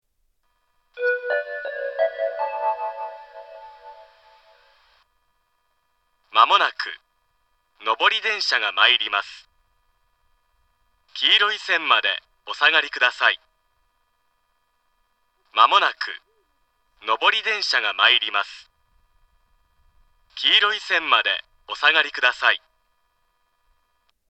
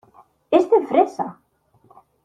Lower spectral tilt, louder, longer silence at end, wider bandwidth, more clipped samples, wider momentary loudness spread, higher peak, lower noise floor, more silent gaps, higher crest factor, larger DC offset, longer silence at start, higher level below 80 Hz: second, 1 dB/octave vs -6.5 dB/octave; about the same, -19 LUFS vs -19 LUFS; first, 1.75 s vs 0.95 s; about the same, 8.8 kHz vs 9.4 kHz; neither; first, 16 LU vs 13 LU; about the same, 0 dBFS vs -2 dBFS; first, -70 dBFS vs -57 dBFS; neither; about the same, 24 dB vs 20 dB; neither; first, 0.95 s vs 0.5 s; about the same, -68 dBFS vs -68 dBFS